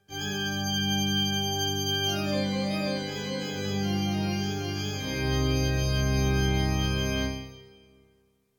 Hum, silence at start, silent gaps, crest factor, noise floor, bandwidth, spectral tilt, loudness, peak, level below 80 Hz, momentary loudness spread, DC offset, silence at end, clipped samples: none; 0.1 s; none; 14 dB; -67 dBFS; 18.5 kHz; -4.5 dB/octave; -28 LUFS; -14 dBFS; -36 dBFS; 6 LU; under 0.1%; 0.95 s; under 0.1%